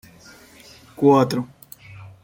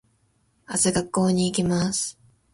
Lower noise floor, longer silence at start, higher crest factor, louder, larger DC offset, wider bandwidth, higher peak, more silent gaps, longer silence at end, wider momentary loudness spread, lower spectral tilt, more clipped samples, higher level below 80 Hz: second, -47 dBFS vs -66 dBFS; first, 1 s vs 0.7 s; about the same, 20 dB vs 16 dB; first, -18 LUFS vs -23 LUFS; neither; first, 16.5 kHz vs 11.5 kHz; first, -4 dBFS vs -10 dBFS; neither; second, 0.15 s vs 0.4 s; first, 25 LU vs 6 LU; first, -7 dB/octave vs -4.5 dB/octave; neither; second, -60 dBFS vs -52 dBFS